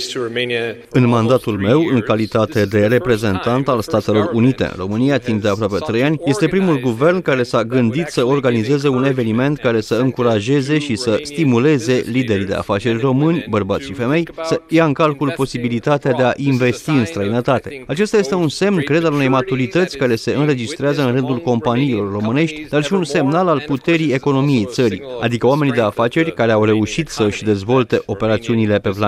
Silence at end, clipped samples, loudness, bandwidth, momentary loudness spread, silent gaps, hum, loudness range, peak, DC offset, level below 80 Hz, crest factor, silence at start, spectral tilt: 0 s; under 0.1%; -16 LUFS; 14.5 kHz; 4 LU; none; none; 1 LU; -2 dBFS; under 0.1%; -48 dBFS; 14 dB; 0 s; -6.5 dB/octave